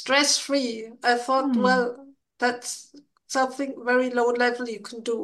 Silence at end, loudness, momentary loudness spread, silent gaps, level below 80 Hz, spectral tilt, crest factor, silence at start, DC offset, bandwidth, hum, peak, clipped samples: 0 s; -24 LUFS; 12 LU; none; -78 dBFS; -2.5 dB/octave; 18 dB; 0 s; under 0.1%; 12.5 kHz; none; -6 dBFS; under 0.1%